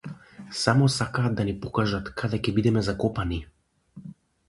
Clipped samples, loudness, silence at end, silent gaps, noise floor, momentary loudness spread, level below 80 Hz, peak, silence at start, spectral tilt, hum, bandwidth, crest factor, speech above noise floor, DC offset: under 0.1%; -26 LUFS; 0.35 s; none; -50 dBFS; 23 LU; -44 dBFS; -4 dBFS; 0.05 s; -6 dB/octave; none; 11.5 kHz; 22 dB; 25 dB; under 0.1%